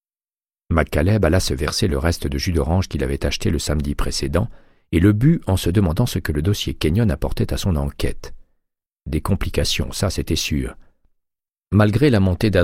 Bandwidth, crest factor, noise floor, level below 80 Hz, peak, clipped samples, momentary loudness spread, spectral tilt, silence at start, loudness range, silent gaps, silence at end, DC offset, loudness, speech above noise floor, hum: 16 kHz; 16 dB; under -90 dBFS; -28 dBFS; -2 dBFS; under 0.1%; 7 LU; -6 dB/octave; 0.7 s; 4 LU; none; 0 s; under 0.1%; -20 LUFS; over 71 dB; none